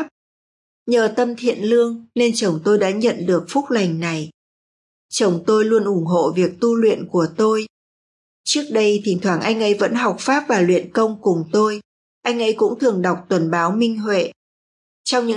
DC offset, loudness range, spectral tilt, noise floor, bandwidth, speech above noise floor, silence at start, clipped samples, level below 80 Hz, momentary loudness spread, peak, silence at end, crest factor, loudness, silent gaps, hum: under 0.1%; 2 LU; -5 dB/octave; under -90 dBFS; 11.5 kHz; over 72 dB; 0 s; under 0.1%; -70 dBFS; 7 LU; -4 dBFS; 0 s; 14 dB; -18 LUFS; 0.11-0.86 s, 4.34-5.09 s, 7.70-8.44 s, 11.85-12.21 s, 14.36-15.05 s; none